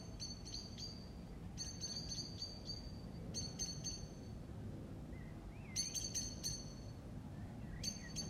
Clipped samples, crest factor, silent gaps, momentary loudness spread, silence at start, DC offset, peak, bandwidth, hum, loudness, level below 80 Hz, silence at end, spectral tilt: under 0.1%; 20 dB; none; 10 LU; 0 s; under 0.1%; -28 dBFS; 16 kHz; none; -46 LUFS; -56 dBFS; 0 s; -3 dB/octave